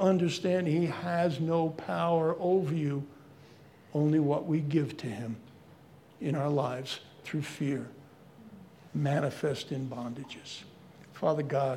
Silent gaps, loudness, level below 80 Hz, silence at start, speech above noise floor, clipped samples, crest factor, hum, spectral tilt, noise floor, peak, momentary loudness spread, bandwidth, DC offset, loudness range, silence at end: none; -31 LUFS; -74 dBFS; 0 s; 25 dB; under 0.1%; 18 dB; none; -7 dB/octave; -56 dBFS; -12 dBFS; 14 LU; 13.5 kHz; under 0.1%; 6 LU; 0 s